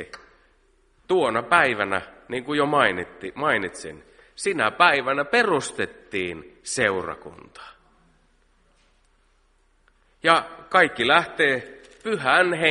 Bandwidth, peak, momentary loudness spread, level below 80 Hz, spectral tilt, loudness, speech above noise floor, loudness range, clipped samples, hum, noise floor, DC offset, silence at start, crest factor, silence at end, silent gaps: 11.5 kHz; 0 dBFS; 17 LU; -60 dBFS; -3.5 dB/octave; -22 LUFS; 40 dB; 8 LU; under 0.1%; none; -62 dBFS; under 0.1%; 0 s; 24 dB; 0 s; none